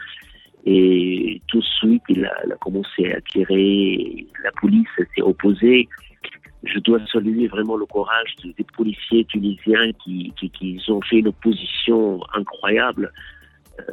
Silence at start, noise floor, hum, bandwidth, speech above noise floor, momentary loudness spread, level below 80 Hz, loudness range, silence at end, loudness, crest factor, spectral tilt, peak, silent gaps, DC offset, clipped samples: 0 s; -45 dBFS; none; 4.2 kHz; 26 dB; 13 LU; -52 dBFS; 3 LU; 0 s; -19 LUFS; 16 dB; -8 dB/octave; -4 dBFS; none; under 0.1%; under 0.1%